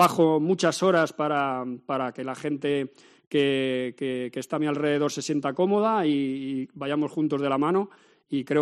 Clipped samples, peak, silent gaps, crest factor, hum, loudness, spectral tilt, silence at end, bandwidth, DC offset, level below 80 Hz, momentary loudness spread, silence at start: under 0.1%; -6 dBFS; 3.27-3.31 s; 18 dB; none; -26 LUFS; -5.5 dB/octave; 0 s; 13 kHz; under 0.1%; -72 dBFS; 9 LU; 0 s